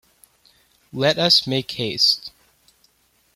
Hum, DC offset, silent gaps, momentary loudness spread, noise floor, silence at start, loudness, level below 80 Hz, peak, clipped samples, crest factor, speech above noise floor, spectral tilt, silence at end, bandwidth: none; under 0.1%; none; 15 LU; -62 dBFS; 0.95 s; -18 LUFS; -62 dBFS; -2 dBFS; under 0.1%; 20 dB; 43 dB; -3.5 dB/octave; 1.05 s; 16.5 kHz